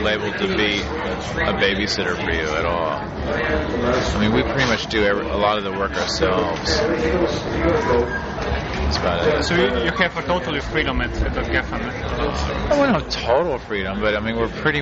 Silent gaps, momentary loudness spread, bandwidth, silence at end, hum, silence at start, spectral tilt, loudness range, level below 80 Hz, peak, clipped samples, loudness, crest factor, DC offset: none; 6 LU; 8 kHz; 0 s; none; 0 s; -3.5 dB/octave; 2 LU; -32 dBFS; -4 dBFS; under 0.1%; -20 LUFS; 16 dB; under 0.1%